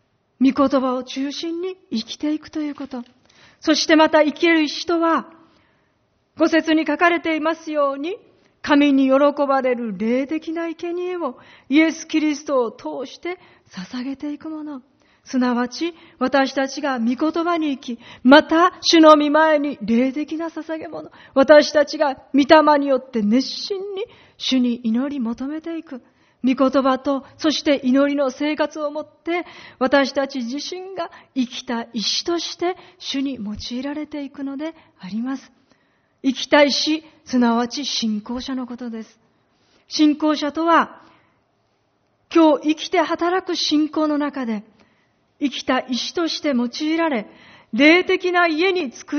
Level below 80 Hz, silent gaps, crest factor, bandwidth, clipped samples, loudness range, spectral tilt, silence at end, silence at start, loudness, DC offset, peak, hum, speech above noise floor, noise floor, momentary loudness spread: -60 dBFS; none; 20 dB; 6.6 kHz; under 0.1%; 9 LU; -2 dB/octave; 0 s; 0.4 s; -19 LUFS; under 0.1%; 0 dBFS; none; 46 dB; -65 dBFS; 16 LU